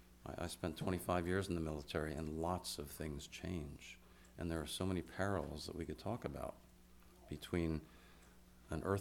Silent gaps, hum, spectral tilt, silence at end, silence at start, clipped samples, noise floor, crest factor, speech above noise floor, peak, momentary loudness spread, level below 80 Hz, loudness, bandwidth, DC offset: none; none; -5.5 dB/octave; 0 s; 0 s; under 0.1%; -63 dBFS; 20 dB; 21 dB; -22 dBFS; 16 LU; -58 dBFS; -43 LUFS; 19 kHz; under 0.1%